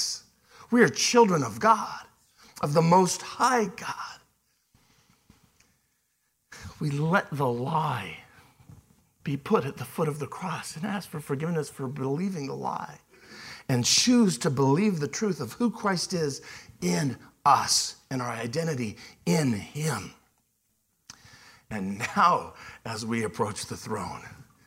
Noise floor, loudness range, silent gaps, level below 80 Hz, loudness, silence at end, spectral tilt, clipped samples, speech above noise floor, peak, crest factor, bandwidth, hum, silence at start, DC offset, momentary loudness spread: -74 dBFS; 8 LU; none; -64 dBFS; -27 LUFS; 0.25 s; -4.5 dB/octave; under 0.1%; 47 dB; -6 dBFS; 22 dB; 16.5 kHz; none; 0 s; under 0.1%; 17 LU